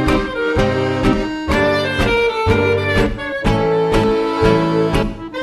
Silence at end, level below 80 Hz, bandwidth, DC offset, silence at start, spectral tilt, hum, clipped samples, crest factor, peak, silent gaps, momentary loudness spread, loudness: 0 s; -28 dBFS; 13 kHz; under 0.1%; 0 s; -6.5 dB/octave; none; under 0.1%; 14 dB; 0 dBFS; none; 4 LU; -16 LUFS